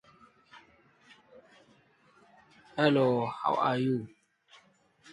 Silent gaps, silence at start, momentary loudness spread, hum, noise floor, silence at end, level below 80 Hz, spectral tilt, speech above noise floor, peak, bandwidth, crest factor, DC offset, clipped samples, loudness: none; 0.55 s; 13 LU; none; -64 dBFS; 1.05 s; -74 dBFS; -7.5 dB/octave; 36 dB; -10 dBFS; 11 kHz; 22 dB; under 0.1%; under 0.1%; -29 LUFS